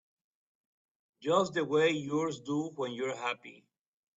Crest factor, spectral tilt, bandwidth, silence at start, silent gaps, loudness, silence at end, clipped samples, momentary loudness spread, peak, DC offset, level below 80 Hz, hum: 20 dB; -5 dB/octave; 8 kHz; 1.2 s; none; -32 LUFS; 0.65 s; under 0.1%; 9 LU; -14 dBFS; under 0.1%; -78 dBFS; none